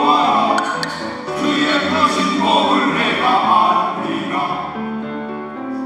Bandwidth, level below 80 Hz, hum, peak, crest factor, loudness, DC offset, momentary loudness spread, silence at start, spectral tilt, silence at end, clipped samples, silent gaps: 13 kHz; -60 dBFS; none; -2 dBFS; 16 dB; -17 LUFS; under 0.1%; 12 LU; 0 s; -4 dB/octave; 0 s; under 0.1%; none